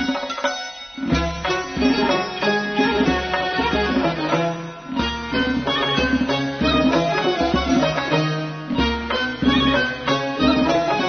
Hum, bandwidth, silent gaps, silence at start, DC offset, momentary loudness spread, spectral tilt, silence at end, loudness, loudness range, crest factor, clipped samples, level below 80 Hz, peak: none; 6.6 kHz; none; 0 s; under 0.1%; 6 LU; -5 dB/octave; 0 s; -20 LUFS; 1 LU; 16 dB; under 0.1%; -36 dBFS; -4 dBFS